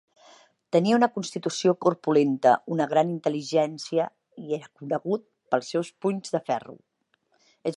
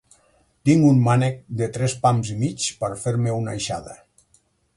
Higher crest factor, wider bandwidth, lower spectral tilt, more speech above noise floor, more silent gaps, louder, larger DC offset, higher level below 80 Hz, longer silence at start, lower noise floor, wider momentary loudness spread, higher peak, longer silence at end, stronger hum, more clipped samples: about the same, 20 dB vs 18 dB; about the same, 11.5 kHz vs 11.5 kHz; about the same, -5.5 dB/octave vs -6 dB/octave; about the same, 45 dB vs 42 dB; neither; second, -26 LUFS vs -21 LUFS; neither; second, -78 dBFS vs -54 dBFS; about the same, 0.75 s vs 0.65 s; first, -70 dBFS vs -62 dBFS; about the same, 11 LU vs 12 LU; about the same, -6 dBFS vs -4 dBFS; second, 0 s vs 0.8 s; neither; neither